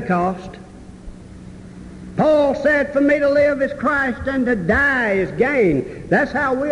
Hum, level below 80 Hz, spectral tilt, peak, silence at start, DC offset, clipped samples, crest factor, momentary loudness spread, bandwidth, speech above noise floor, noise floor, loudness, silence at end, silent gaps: none; -40 dBFS; -7 dB/octave; -6 dBFS; 0 s; under 0.1%; under 0.1%; 14 dB; 22 LU; 11 kHz; 20 dB; -38 dBFS; -17 LUFS; 0 s; none